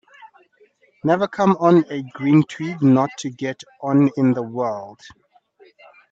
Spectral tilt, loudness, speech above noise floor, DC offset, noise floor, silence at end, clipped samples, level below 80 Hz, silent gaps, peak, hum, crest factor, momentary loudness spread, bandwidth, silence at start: -7.5 dB/octave; -19 LUFS; 39 dB; under 0.1%; -57 dBFS; 1.2 s; under 0.1%; -66 dBFS; none; -2 dBFS; none; 18 dB; 13 LU; 7.8 kHz; 0.2 s